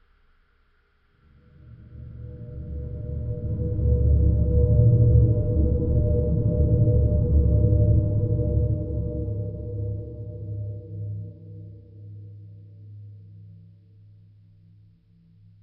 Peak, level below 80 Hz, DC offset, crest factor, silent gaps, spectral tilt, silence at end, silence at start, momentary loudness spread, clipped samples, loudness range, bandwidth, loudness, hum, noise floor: -6 dBFS; -28 dBFS; under 0.1%; 18 dB; none; -15.5 dB/octave; 2.1 s; 1.65 s; 24 LU; under 0.1%; 18 LU; 1.4 kHz; -23 LUFS; none; -64 dBFS